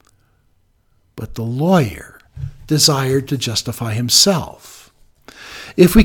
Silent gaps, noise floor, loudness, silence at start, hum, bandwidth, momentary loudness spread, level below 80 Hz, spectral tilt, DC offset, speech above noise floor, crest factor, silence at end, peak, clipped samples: none; -59 dBFS; -15 LUFS; 1.15 s; none; 19 kHz; 22 LU; -32 dBFS; -4 dB/octave; under 0.1%; 44 dB; 18 dB; 0 s; 0 dBFS; under 0.1%